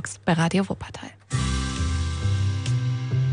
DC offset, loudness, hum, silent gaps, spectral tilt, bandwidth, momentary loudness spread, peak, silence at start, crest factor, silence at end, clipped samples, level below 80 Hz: under 0.1%; -25 LUFS; none; none; -5.5 dB/octave; 10.5 kHz; 9 LU; -10 dBFS; 0 s; 14 dB; 0 s; under 0.1%; -34 dBFS